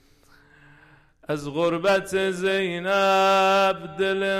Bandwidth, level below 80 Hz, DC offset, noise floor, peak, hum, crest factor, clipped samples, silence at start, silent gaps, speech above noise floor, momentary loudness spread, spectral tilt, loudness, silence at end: 16 kHz; -58 dBFS; under 0.1%; -56 dBFS; -12 dBFS; none; 10 dB; under 0.1%; 1.3 s; none; 34 dB; 8 LU; -4.5 dB/octave; -22 LUFS; 0 s